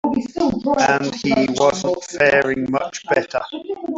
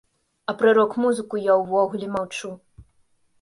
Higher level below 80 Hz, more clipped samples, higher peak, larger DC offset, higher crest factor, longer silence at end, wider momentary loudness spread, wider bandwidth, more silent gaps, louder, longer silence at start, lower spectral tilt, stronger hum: first, -52 dBFS vs -62 dBFS; neither; first, -2 dBFS vs -6 dBFS; neither; about the same, 16 dB vs 16 dB; second, 0 s vs 0.6 s; second, 9 LU vs 14 LU; second, 8 kHz vs 11.5 kHz; neither; first, -19 LUFS vs -22 LUFS; second, 0.05 s vs 0.5 s; about the same, -4.5 dB/octave vs -5 dB/octave; neither